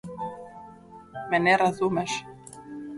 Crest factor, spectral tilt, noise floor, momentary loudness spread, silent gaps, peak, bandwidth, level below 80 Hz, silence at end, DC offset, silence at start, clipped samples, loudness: 22 dB; -4.5 dB/octave; -47 dBFS; 23 LU; none; -6 dBFS; 11.5 kHz; -62 dBFS; 0 s; under 0.1%; 0.05 s; under 0.1%; -25 LUFS